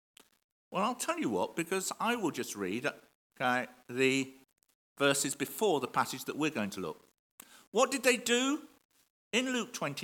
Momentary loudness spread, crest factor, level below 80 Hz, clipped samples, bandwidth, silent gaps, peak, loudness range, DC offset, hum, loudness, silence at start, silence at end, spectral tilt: 9 LU; 22 dB; -82 dBFS; under 0.1%; 18 kHz; 3.15-3.30 s, 4.75-4.96 s, 7.19-7.38 s, 7.67-7.72 s, 8.85-8.89 s, 9.10-9.31 s; -12 dBFS; 2 LU; under 0.1%; none; -32 LUFS; 0.7 s; 0 s; -3 dB/octave